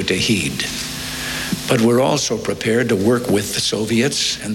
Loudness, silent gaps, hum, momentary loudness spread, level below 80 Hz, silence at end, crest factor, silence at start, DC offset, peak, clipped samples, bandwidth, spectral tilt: -18 LUFS; none; none; 7 LU; -44 dBFS; 0 s; 16 dB; 0 s; under 0.1%; -2 dBFS; under 0.1%; 17 kHz; -4 dB/octave